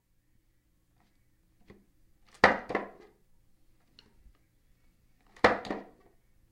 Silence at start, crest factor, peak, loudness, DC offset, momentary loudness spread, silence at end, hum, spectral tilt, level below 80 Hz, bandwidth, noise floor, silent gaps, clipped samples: 2.45 s; 30 dB; -6 dBFS; -28 LUFS; under 0.1%; 16 LU; 0.7 s; none; -4.5 dB/octave; -60 dBFS; 12 kHz; -70 dBFS; none; under 0.1%